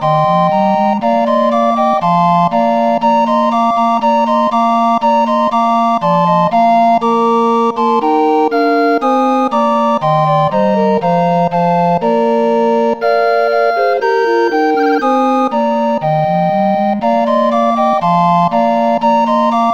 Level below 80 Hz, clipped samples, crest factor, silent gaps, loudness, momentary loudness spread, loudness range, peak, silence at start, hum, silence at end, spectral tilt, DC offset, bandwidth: -52 dBFS; under 0.1%; 10 dB; none; -12 LUFS; 2 LU; 1 LU; -2 dBFS; 0 s; none; 0 s; -7.5 dB/octave; 0.5%; 8.6 kHz